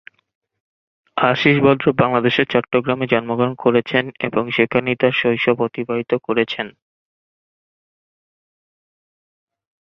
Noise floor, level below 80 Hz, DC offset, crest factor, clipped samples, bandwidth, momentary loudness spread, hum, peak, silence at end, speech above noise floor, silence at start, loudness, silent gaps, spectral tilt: under -90 dBFS; -56 dBFS; under 0.1%; 18 dB; under 0.1%; 6.2 kHz; 8 LU; none; 0 dBFS; 3.1 s; over 72 dB; 1.15 s; -18 LUFS; none; -7.5 dB/octave